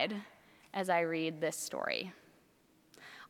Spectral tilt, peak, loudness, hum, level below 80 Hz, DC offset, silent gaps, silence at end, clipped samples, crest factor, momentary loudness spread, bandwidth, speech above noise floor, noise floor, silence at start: -3.5 dB/octave; -18 dBFS; -36 LUFS; none; -84 dBFS; under 0.1%; none; 0.05 s; under 0.1%; 20 dB; 21 LU; 18.5 kHz; 32 dB; -68 dBFS; 0 s